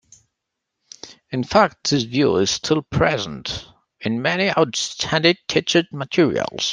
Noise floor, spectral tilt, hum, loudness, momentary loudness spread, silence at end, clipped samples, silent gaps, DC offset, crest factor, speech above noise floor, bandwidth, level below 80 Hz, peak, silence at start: -80 dBFS; -4 dB/octave; none; -20 LUFS; 12 LU; 0 s; under 0.1%; none; under 0.1%; 20 dB; 60 dB; 10 kHz; -50 dBFS; -2 dBFS; 1.05 s